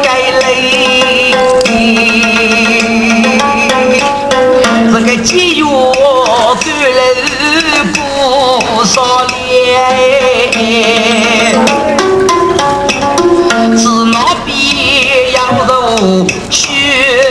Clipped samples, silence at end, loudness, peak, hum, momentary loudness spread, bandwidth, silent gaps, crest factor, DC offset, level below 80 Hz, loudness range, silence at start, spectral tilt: 0.7%; 0 s; -8 LUFS; 0 dBFS; none; 3 LU; 11 kHz; none; 8 dB; under 0.1%; -36 dBFS; 1 LU; 0 s; -3 dB/octave